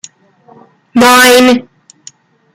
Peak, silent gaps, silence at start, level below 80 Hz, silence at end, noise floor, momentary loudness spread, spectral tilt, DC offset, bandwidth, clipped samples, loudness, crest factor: 0 dBFS; none; 0.95 s; -50 dBFS; 0.95 s; -44 dBFS; 11 LU; -2 dB/octave; under 0.1%; 19 kHz; 0.2%; -6 LUFS; 10 dB